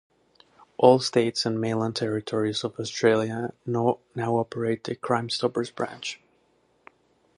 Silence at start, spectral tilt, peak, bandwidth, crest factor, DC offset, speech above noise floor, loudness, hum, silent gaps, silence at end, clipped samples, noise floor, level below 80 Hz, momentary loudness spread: 0.8 s; -5 dB/octave; -4 dBFS; 11 kHz; 24 dB; under 0.1%; 41 dB; -26 LUFS; none; none; 1.2 s; under 0.1%; -66 dBFS; -68 dBFS; 11 LU